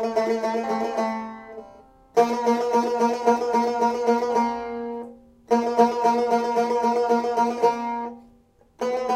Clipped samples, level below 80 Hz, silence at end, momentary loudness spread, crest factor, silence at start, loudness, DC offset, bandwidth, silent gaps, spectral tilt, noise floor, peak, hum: under 0.1%; -64 dBFS; 0 s; 12 LU; 18 dB; 0 s; -23 LUFS; under 0.1%; 14 kHz; none; -5 dB/octave; -57 dBFS; -4 dBFS; none